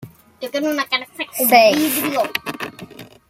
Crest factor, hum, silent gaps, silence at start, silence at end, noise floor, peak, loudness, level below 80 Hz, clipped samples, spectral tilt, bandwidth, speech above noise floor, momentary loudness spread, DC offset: 18 dB; none; none; 0 s; 0.25 s; -39 dBFS; 0 dBFS; -17 LUFS; -64 dBFS; under 0.1%; -2.5 dB/octave; 16.5 kHz; 21 dB; 20 LU; under 0.1%